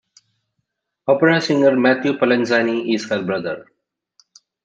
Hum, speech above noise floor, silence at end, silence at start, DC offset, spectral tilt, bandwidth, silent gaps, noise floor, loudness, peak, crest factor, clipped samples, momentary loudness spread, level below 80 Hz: none; 58 dB; 1 s; 1.05 s; under 0.1%; -6 dB/octave; 8 kHz; none; -75 dBFS; -17 LUFS; -2 dBFS; 18 dB; under 0.1%; 11 LU; -66 dBFS